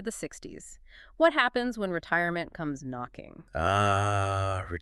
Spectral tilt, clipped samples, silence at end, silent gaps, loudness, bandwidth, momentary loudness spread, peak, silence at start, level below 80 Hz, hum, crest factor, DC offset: -5 dB/octave; under 0.1%; 0 s; none; -28 LUFS; 12.5 kHz; 19 LU; -10 dBFS; 0 s; -52 dBFS; none; 20 dB; under 0.1%